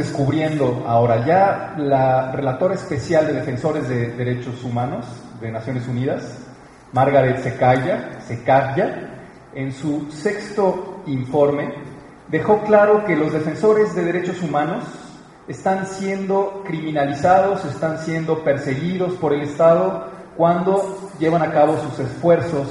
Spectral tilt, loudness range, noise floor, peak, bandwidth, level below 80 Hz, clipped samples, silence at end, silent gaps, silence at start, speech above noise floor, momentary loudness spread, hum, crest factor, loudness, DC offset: -7.5 dB/octave; 5 LU; -42 dBFS; -2 dBFS; 11.5 kHz; -52 dBFS; under 0.1%; 0 s; none; 0 s; 23 dB; 13 LU; none; 18 dB; -19 LUFS; under 0.1%